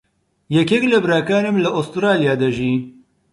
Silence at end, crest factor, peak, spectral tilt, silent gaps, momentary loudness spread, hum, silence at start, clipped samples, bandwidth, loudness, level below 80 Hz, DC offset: 0.4 s; 16 dB; -2 dBFS; -6.5 dB/octave; none; 6 LU; none; 0.5 s; under 0.1%; 11.5 kHz; -17 LUFS; -54 dBFS; under 0.1%